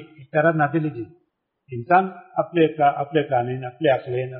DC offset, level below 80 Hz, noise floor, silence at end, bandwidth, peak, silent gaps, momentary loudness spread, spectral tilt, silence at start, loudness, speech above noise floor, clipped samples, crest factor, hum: under 0.1%; -64 dBFS; -66 dBFS; 0 s; 4.3 kHz; -4 dBFS; none; 13 LU; -5.5 dB/octave; 0 s; -21 LUFS; 45 dB; under 0.1%; 18 dB; none